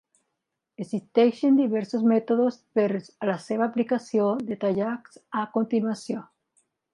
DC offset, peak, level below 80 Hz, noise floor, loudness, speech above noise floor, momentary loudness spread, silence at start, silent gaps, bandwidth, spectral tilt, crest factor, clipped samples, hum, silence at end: under 0.1%; -8 dBFS; -74 dBFS; -82 dBFS; -25 LUFS; 58 dB; 11 LU; 0.8 s; none; 11 kHz; -7 dB/octave; 18 dB; under 0.1%; none; 0.7 s